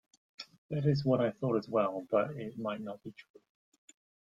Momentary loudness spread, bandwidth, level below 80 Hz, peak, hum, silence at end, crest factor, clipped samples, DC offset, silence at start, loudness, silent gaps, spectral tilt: 20 LU; 7.6 kHz; -72 dBFS; -16 dBFS; none; 1.05 s; 18 dB; under 0.1%; under 0.1%; 0.4 s; -33 LUFS; 0.58-0.69 s; -8.5 dB/octave